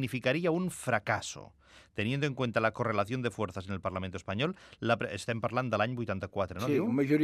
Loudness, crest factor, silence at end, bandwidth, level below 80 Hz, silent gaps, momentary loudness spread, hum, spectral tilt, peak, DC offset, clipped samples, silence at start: -32 LUFS; 20 dB; 0 s; 14.5 kHz; -66 dBFS; none; 8 LU; none; -6 dB/octave; -12 dBFS; under 0.1%; under 0.1%; 0 s